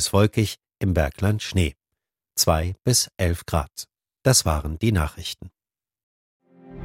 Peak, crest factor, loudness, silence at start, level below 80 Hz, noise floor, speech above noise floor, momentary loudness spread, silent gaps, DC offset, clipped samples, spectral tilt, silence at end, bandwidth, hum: -4 dBFS; 20 dB; -23 LUFS; 0 s; -36 dBFS; -84 dBFS; 62 dB; 14 LU; 6.03-6.40 s; under 0.1%; under 0.1%; -4 dB/octave; 0 s; 16.5 kHz; none